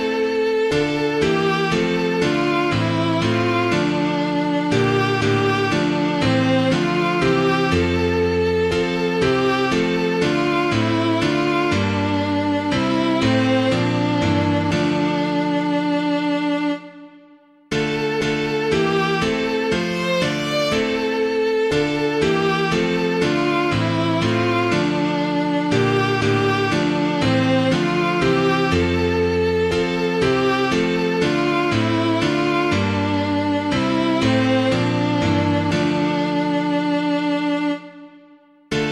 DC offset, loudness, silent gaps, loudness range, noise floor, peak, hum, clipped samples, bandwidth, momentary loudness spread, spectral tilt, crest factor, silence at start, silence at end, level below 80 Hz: under 0.1%; -19 LUFS; none; 2 LU; -50 dBFS; -4 dBFS; none; under 0.1%; 13 kHz; 3 LU; -6 dB/octave; 14 dB; 0 s; 0 s; -44 dBFS